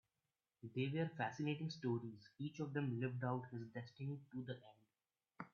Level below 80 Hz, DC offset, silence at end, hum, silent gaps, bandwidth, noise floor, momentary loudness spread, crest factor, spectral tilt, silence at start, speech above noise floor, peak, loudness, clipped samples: -84 dBFS; under 0.1%; 0.05 s; none; none; 7 kHz; under -90 dBFS; 10 LU; 18 dB; -6 dB/octave; 0.65 s; over 45 dB; -28 dBFS; -46 LUFS; under 0.1%